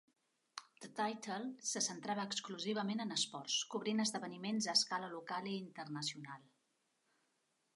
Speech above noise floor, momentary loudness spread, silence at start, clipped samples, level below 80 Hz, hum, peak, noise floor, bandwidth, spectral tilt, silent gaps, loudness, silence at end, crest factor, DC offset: 41 dB; 17 LU; 0.55 s; under 0.1%; under -90 dBFS; none; -18 dBFS; -82 dBFS; 11.5 kHz; -2.5 dB/octave; none; -39 LUFS; 1.35 s; 24 dB; under 0.1%